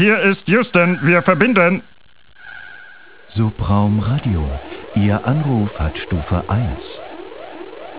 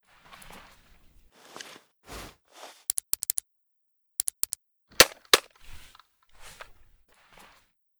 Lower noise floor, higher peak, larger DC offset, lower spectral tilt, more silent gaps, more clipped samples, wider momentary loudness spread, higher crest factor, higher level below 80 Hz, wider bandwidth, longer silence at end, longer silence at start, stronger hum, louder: second, -43 dBFS vs -75 dBFS; about the same, 0 dBFS vs -2 dBFS; first, 1% vs under 0.1%; first, -11 dB/octave vs 0 dB/octave; neither; neither; second, 21 LU vs 29 LU; second, 18 dB vs 30 dB; first, -32 dBFS vs -56 dBFS; second, 4 kHz vs over 20 kHz; second, 0 s vs 1.5 s; second, 0 s vs 2.1 s; neither; first, -17 LUFS vs -25 LUFS